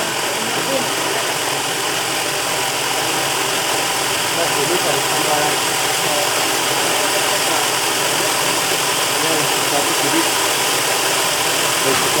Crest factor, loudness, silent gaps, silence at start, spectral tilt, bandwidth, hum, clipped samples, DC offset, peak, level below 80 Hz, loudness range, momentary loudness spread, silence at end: 16 dB; -16 LUFS; none; 0 s; -1 dB/octave; over 20 kHz; none; under 0.1%; under 0.1%; -2 dBFS; -56 dBFS; 2 LU; 3 LU; 0 s